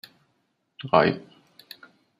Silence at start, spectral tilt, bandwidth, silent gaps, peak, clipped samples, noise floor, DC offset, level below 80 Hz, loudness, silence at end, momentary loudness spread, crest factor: 0.8 s; -7 dB/octave; 15 kHz; none; -4 dBFS; under 0.1%; -72 dBFS; under 0.1%; -64 dBFS; -23 LUFS; 1 s; 25 LU; 24 dB